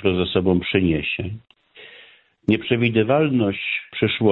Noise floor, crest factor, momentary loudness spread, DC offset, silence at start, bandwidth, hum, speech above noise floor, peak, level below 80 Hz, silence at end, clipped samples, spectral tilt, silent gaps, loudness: -50 dBFS; 18 dB; 9 LU; under 0.1%; 0 s; 4.2 kHz; none; 30 dB; -4 dBFS; -48 dBFS; 0 s; under 0.1%; -9.5 dB/octave; none; -20 LUFS